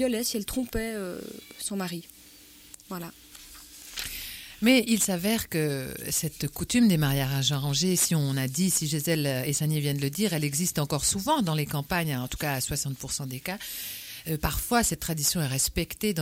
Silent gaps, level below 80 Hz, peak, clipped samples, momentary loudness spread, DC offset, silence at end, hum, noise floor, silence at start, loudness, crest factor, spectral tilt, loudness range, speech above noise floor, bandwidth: none; -46 dBFS; -8 dBFS; under 0.1%; 15 LU; under 0.1%; 0 s; none; -52 dBFS; 0 s; -27 LUFS; 20 dB; -4 dB/octave; 9 LU; 24 dB; 16.5 kHz